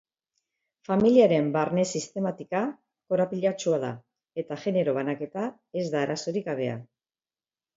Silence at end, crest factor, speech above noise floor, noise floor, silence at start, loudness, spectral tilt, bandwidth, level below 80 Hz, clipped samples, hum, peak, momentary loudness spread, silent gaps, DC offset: 0.95 s; 20 dB; over 64 dB; under -90 dBFS; 0.9 s; -27 LUFS; -6 dB/octave; 7.8 kHz; -70 dBFS; under 0.1%; none; -8 dBFS; 14 LU; none; under 0.1%